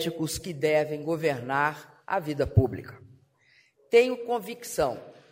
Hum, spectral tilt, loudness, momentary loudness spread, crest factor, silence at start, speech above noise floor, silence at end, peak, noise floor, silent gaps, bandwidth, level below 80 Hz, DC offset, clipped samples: none; -5.5 dB/octave; -27 LUFS; 11 LU; 20 dB; 0 s; 37 dB; 0.2 s; -8 dBFS; -63 dBFS; none; 16 kHz; -50 dBFS; under 0.1%; under 0.1%